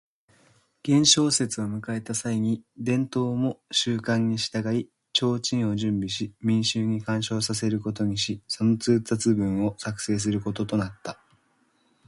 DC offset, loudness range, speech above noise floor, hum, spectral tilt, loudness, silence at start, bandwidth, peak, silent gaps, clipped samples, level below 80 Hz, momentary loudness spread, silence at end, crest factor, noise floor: under 0.1%; 2 LU; 42 dB; none; -4.5 dB/octave; -25 LUFS; 0.85 s; 11.5 kHz; -4 dBFS; none; under 0.1%; -58 dBFS; 8 LU; 0.95 s; 22 dB; -67 dBFS